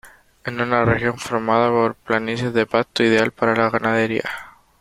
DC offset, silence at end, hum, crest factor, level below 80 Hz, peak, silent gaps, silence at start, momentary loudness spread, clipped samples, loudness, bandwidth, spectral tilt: under 0.1%; 0.3 s; none; 18 dB; -50 dBFS; -2 dBFS; none; 0.05 s; 8 LU; under 0.1%; -19 LUFS; 15.5 kHz; -6 dB/octave